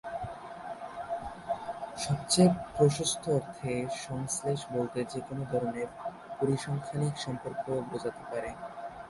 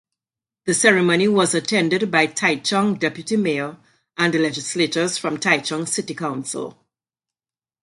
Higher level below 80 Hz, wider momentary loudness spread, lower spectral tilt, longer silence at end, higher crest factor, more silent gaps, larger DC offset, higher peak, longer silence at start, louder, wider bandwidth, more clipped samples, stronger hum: first, -60 dBFS vs -66 dBFS; first, 15 LU vs 11 LU; first, -5 dB/octave vs -3.5 dB/octave; second, 0 s vs 1.15 s; about the same, 20 dB vs 20 dB; neither; neither; second, -12 dBFS vs 0 dBFS; second, 0.05 s vs 0.65 s; second, -32 LUFS vs -19 LUFS; about the same, 11.5 kHz vs 11.5 kHz; neither; neither